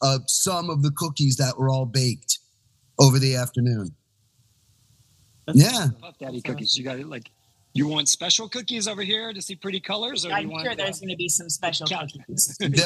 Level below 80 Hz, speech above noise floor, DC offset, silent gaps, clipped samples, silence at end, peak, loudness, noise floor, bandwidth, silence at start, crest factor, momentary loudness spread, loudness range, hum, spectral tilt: -64 dBFS; 41 dB; under 0.1%; none; under 0.1%; 0 s; 0 dBFS; -23 LUFS; -64 dBFS; 12.5 kHz; 0 s; 24 dB; 14 LU; 4 LU; none; -4 dB/octave